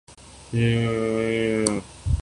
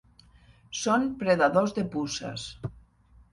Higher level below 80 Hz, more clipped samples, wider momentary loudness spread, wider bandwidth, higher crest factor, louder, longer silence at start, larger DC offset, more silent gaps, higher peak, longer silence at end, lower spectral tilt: first, -36 dBFS vs -56 dBFS; neither; second, 7 LU vs 16 LU; about the same, 11.5 kHz vs 11.5 kHz; about the same, 22 dB vs 20 dB; first, -24 LUFS vs -27 LUFS; second, 0.1 s vs 0.7 s; neither; neither; first, -2 dBFS vs -10 dBFS; second, 0 s vs 0.55 s; about the same, -5.5 dB/octave vs -4.5 dB/octave